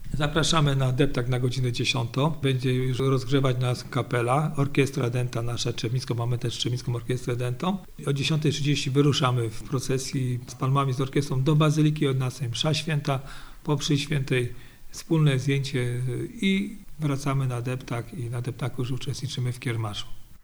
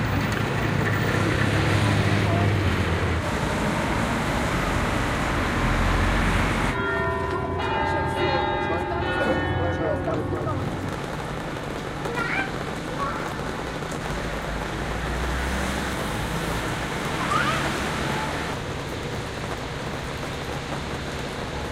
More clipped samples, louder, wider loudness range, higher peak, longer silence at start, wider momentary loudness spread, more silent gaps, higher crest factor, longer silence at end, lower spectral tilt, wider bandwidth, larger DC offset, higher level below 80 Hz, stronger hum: neither; about the same, -26 LUFS vs -25 LUFS; about the same, 4 LU vs 6 LU; about the same, -8 dBFS vs -8 dBFS; about the same, 0 s vs 0 s; about the same, 9 LU vs 8 LU; neither; about the same, 18 dB vs 18 dB; about the same, 0.05 s vs 0 s; about the same, -5.5 dB/octave vs -5.5 dB/octave; first, over 20 kHz vs 16 kHz; neither; second, -44 dBFS vs -36 dBFS; neither